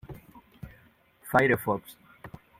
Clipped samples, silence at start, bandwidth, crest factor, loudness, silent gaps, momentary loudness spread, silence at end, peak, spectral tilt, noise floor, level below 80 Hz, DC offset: under 0.1%; 0.1 s; 16.5 kHz; 24 dB; -26 LUFS; none; 25 LU; 0.3 s; -6 dBFS; -6 dB/octave; -60 dBFS; -58 dBFS; under 0.1%